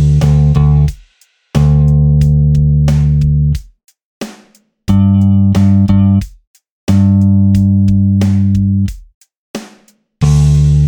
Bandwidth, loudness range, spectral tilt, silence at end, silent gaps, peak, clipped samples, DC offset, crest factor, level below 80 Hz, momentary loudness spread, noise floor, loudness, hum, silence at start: 9.4 kHz; 2 LU; -8.5 dB/octave; 0 s; 4.04-4.21 s, 6.47-6.54 s, 6.70-6.87 s, 9.14-9.21 s, 9.37-9.54 s; 0 dBFS; under 0.1%; under 0.1%; 10 dB; -20 dBFS; 16 LU; -52 dBFS; -11 LUFS; none; 0 s